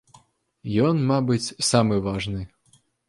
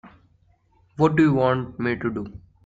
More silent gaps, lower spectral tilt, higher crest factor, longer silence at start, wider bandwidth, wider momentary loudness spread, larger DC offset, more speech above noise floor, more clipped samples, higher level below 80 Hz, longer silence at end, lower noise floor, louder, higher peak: neither; second, -5.5 dB/octave vs -8.5 dB/octave; about the same, 18 dB vs 18 dB; first, 0.65 s vs 0.05 s; first, 11.5 kHz vs 7.8 kHz; second, 13 LU vs 17 LU; neither; about the same, 40 dB vs 40 dB; neither; first, -48 dBFS vs -54 dBFS; first, 0.6 s vs 0.3 s; about the same, -62 dBFS vs -61 dBFS; about the same, -23 LUFS vs -22 LUFS; about the same, -6 dBFS vs -6 dBFS